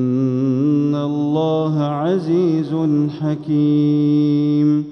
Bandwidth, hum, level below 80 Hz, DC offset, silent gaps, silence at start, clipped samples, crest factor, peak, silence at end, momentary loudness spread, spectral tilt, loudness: 6.2 kHz; none; -66 dBFS; under 0.1%; none; 0 s; under 0.1%; 10 dB; -6 dBFS; 0 s; 4 LU; -9.5 dB/octave; -17 LUFS